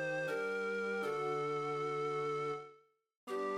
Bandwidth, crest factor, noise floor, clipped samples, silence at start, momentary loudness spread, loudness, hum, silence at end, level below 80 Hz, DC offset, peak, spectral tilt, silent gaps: 13.5 kHz; 12 dB; -65 dBFS; under 0.1%; 0 s; 7 LU; -38 LUFS; none; 0 s; -88 dBFS; under 0.1%; -28 dBFS; -5.5 dB/octave; 3.16-3.27 s